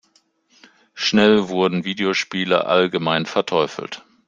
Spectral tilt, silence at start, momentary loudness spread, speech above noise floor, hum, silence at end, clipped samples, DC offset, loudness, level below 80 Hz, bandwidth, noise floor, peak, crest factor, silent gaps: -5 dB/octave; 0.95 s; 8 LU; 43 dB; none; 0.3 s; under 0.1%; under 0.1%; -19 LUFS; -60 dBFS; 7.6 kHz; -61 dBFS; -2 dBFS; 18 dB; none